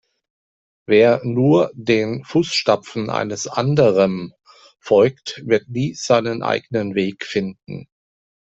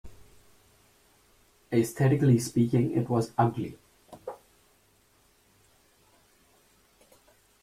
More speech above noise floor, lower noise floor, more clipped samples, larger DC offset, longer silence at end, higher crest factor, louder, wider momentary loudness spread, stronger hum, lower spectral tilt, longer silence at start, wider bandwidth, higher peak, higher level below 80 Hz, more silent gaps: first, over 72 dB vs 40 dB; first, under -90 dBFS vs -65 dBFS; neither; neither; second, 0.7 s vs 3.25 s; about the same, 16 dB vs 20 dB; first, -18 LUFS vs -26 LUFS; second, 11 LU vs 20 LU; neither; second, -5.5 dB/octave vs -7.5 dB/octave; first, 0.9 s vs 0.05 s; second, 8.2 kHz vs 15 kHz; first, -2 dBFS vs -12 dBFS; about the same, -58 dBFS vs -62 dBFS; neither